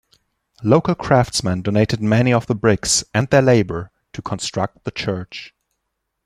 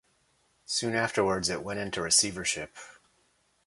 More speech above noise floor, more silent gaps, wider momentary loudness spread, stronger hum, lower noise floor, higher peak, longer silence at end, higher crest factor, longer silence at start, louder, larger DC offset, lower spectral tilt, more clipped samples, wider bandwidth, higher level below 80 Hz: first, 58 dB vs 41 dB; neither; about the same, 13 LU vs 12 LU; neither; first, -76 dBFS vs -70 dBFS; first, 0 dBFS vs -10 dBFS; about the same, 0.8 s vs 0.75 s; about the same, 18 dB vs 20 dB; about the same, 0.6 s vs 0.7 s; first, -18 LUFS vs -28 LUFS; neither; first, -5 dB/octave vs -2 dB/octave; neither; first, 13.5 kHz vs 12 kHz; first, -46 dBFS vs -60 dBFS